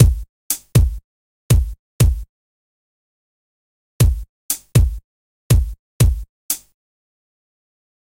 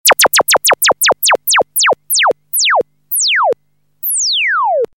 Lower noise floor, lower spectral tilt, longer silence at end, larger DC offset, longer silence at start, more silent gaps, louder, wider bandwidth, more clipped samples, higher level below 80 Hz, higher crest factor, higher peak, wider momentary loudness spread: first, under -90 dBFS vs -59 dBFS; first, -5.5 dB/octave vs 1.5 dB/octave; first, 1.55 s vs 0.1 s; second, under 0.1% vs 0.1%; about the same, 0 s vs 0.05 s; first, 0.29-0.50 s, 1.04-1.49 s, 1.79-1.99 s, 2.29-3.99 s, 4.29-4.49 s, 5.04-5.50 s, 5.79-6.00 s, 6.29-6.49 s vs none; second, -19 LUFS vs -11 LUFS; about the same, 16 kHz vs 17 kHz; neither; first, -24 dBFS vs -60 dBFS; first, 20 dB vs 12 dB; about the same, 0 dBFS vs 0 dBFS; first, 13 LU vs 7 LU